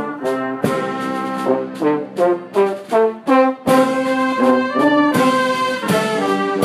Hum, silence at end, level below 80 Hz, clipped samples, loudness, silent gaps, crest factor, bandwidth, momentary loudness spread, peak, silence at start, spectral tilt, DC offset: none; 0 s; -60 dBFS; under 0.1%; -17 LUFS; none; 14 dB; 15.5 kHz; 7 LU; -2 dBFS; 0 s; -5.5 dB/octave; under 0.1%